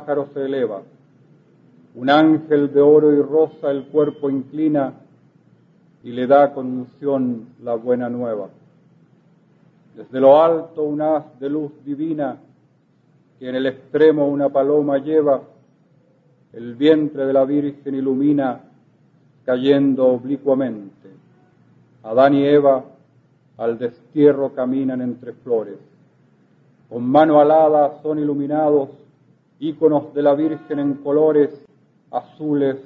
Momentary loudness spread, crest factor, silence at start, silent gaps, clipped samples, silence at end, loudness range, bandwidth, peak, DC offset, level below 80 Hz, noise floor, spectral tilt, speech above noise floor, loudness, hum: 14 LU; 18 dB; 0 s; none; under 0.1%; 0.05 s; 5 LU; 5.2 kHz; 0 dBFS; under 0.1%; -70 dBFS; -57 dBFS; -9.5 dB/octave; 40 dB; -18 LUFS; none